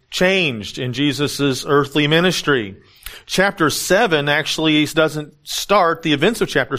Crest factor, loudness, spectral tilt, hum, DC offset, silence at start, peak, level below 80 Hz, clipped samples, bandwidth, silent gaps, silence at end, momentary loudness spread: 16 dB; -17 LUFS; -4 dB/octave; none; under 0.1%; 0.1 s; 0 dBFS; -46 dBFS; under 0.1%; 15.5 kHz; none; 0 s; 10 LU